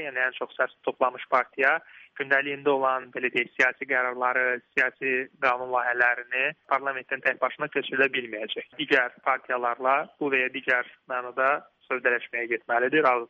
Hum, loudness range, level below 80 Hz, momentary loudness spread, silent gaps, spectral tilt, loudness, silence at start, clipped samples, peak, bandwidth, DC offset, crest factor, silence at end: none; 2 LU; -76 dBFS; 7 LU; none; -4.5 dB/octave; -26 LUFS; 0 s; under 0.1%; -8 dBFS; 8 kHz; under 0.1%; 18 dB; 0.05 s